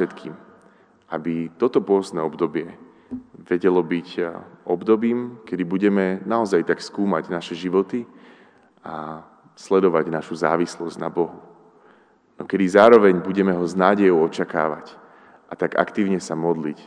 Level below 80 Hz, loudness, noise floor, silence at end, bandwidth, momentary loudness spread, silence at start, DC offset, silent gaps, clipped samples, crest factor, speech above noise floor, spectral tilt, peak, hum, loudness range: -68 dBFS; -21 LUFS; -55 dBFS; 0.05 s; 10 kHz; 18 LU; 0 s; under 0.1%; none; under 0.1%; 22 dB; 35 dB; -6.5 dB/octave; 0 dBFS; none; 7 LU